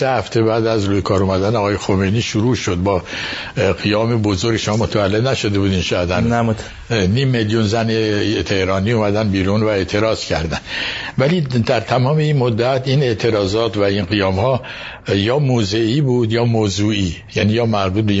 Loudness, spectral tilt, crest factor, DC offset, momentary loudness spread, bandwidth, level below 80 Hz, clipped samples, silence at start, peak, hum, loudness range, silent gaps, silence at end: -17 LUFS; -6 dB/octave; 16 dB; under 0.1%; 5 LU; 8 kHz; -40 dBFS; under 0.1%; 0 s; 0 dBFS; none; 1 LU; none; 0 s